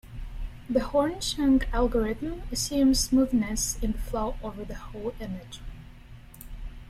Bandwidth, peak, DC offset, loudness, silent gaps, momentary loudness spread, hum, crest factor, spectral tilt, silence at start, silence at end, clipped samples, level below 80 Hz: 15.5 kHz; -10 dBFS; under 0.1%; -27 LUFS; none; 20 LU; none; 18 dB; -4 dB/octave; 0.05 s; 0 s; under 0.1%; -36 dBFS